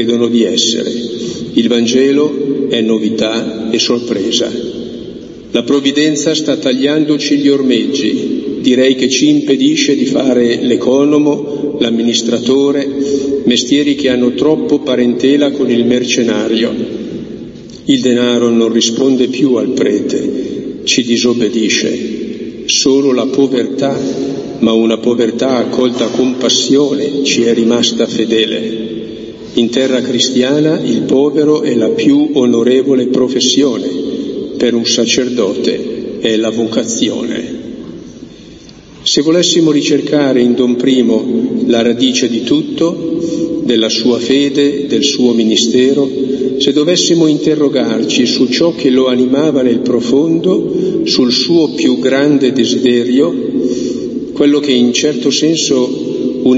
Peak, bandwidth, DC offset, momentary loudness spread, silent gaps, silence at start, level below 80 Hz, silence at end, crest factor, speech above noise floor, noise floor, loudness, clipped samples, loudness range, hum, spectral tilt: 0 dBFS; 8 kHz; under 0.1%; 8 LU; none; 0 s; -50 dBFS; 0 s; 12 dB; 24 dB; -35 dBFS; -12 LUFS; under 0.1%; 3 LU; none; -4 dB/octave